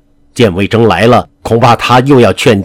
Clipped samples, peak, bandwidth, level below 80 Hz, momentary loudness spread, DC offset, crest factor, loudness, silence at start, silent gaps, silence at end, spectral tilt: 3%; 0 dBFS; 16.5 kHz; -38 dBFS; 5 LU; under 0.1%; 8 dB; -8 LUFS; 0.35 s; none; 0 s; -6 dB/octave